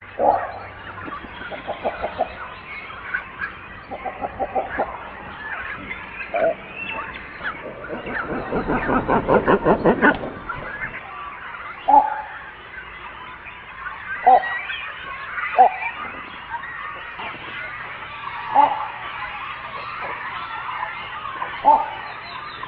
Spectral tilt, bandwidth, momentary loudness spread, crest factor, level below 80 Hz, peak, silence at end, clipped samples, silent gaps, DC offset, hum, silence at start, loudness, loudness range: -9 dB/octave; 5 kHz; 17 LU; 22 dB; -46 dBFS; -2 dBFS; 0 s; under 0.1%; none; under 0.1%; none; 0 s; -23 LUFS; 8 LU